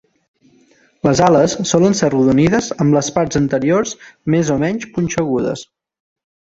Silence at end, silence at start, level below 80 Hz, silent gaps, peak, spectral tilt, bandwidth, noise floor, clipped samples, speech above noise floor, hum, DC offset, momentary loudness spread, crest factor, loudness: 0.85 s; 1.05 s; -46 dBFS; none; 0 dBFS; -5.5 dB/octave; 8 kHz; -53 dBFS; under 0.1%; 38 dB; none; under 0.1%; 8 LU; 16 dB; -15 LUFS